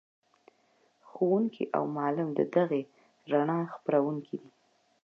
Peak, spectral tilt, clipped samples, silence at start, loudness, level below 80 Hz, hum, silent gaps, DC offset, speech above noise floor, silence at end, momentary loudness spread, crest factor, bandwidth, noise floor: -12 dBFS; -9.5 dB/octave; under 0.1%; 1.15 s; -30 LUFS; -86 dBFS; none; none; under 0.1%; 40 dB; 0.65 s; 9 LU; 20 dB; 6.6 kHz; -69 dBFS